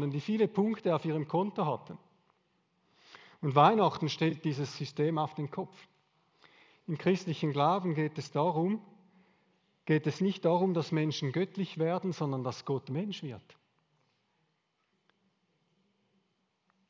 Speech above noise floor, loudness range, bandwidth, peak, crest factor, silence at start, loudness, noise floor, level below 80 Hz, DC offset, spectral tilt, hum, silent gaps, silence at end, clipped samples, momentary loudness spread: 47 dB; 7 LU; 7.6 kHz; -10 dBFS; 24 dB; 0 s; -31 LUFS; -78 dBFS; -78 dBFS; under 0.1%; -7 dB/octave; none; none; 3.5 s; under 0.1%; 11 LU